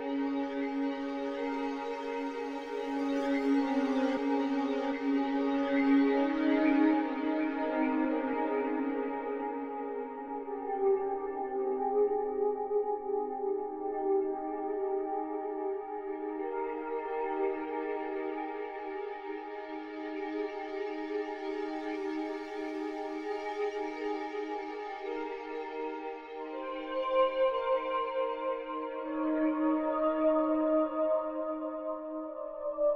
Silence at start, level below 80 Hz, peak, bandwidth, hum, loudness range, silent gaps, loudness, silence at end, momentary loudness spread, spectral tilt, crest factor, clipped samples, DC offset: 0 s; -66 dBFS; -16 dBFS; 7 kHz; none; 8 LU; none; -33 LUFS; 0 s; 10 LU; -5 dB/octave; 16 dB; under 0.1%; under 0.1%